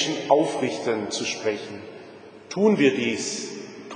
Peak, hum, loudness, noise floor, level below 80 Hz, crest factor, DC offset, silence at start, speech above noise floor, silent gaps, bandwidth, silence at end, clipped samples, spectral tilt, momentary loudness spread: -4 dBFS; none; -24 LUFS; -44 dBFS; -72 dBFS; 20 dB; under 0.1%; 0 s; 21 dB; none; 10 kHz; 0 s; under 0.1%; -4 dB/octave; 19 LU